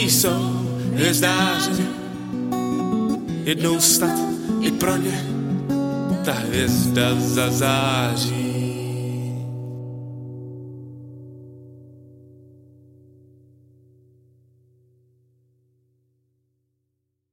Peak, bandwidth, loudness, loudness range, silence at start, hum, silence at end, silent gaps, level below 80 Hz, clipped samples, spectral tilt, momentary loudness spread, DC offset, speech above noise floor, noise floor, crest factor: -4 dBFS; 17 kHz; -21 LUFS; 17 LU; 0 s; none; 5.35 s; none; -52 dBFS; under 0.1%; -4 dB/octave; 18 LU; under 0.1%; 57 dB; -76 dBFS; 20 dB